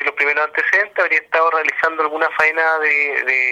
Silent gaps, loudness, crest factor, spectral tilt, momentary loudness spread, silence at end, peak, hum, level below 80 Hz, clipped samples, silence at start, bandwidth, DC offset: none; -16 LUFS; 14 dB; -2 dB/octave; 3 LU; 0 s; -2 dBFS; none; -68 dBFS; under 0.1%; 0 s; 14.5 kHz; under 0.1%